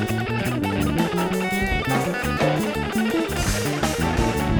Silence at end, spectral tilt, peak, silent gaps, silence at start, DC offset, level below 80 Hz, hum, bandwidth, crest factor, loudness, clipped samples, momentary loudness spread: 0 s; -5 dB/octave; -4 dBFS; none; 0 s; under 0.1%; -34 dBFS; none; over 20 kHz; 18 dB; -23 LUFS; under 0.1%; 2 LU